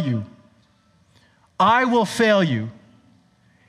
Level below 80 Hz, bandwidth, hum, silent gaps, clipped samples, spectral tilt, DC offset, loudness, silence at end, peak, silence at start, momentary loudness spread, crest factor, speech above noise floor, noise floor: -66 dBFS; 13.5 kHz; none; none; under 0.1%; -5.5 dB/octave; under 0.1%; -19 LUFS; 0.95 s; -4 dBFS; 0 s; 14 LU; 18 dB; 40 dB; -59 dBFS